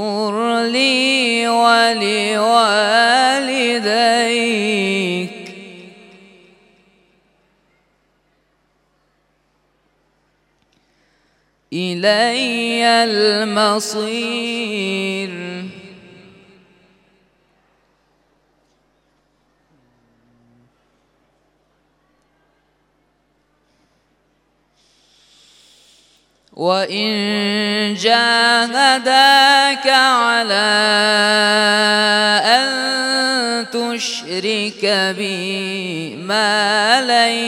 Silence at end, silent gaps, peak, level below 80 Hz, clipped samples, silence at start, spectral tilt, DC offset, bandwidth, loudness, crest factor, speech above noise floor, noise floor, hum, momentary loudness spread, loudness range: 0 s; none; 0 dBFS; -70 dBFS; under 0.1%; 0 s; -2.5 dB/octave; under 0.1%; 16.5 kHz; -14 LUFS; 18 dB; 47 dB; -63 dBFS; 50 Hz at -70 dBFS; 10 LU; 14 LU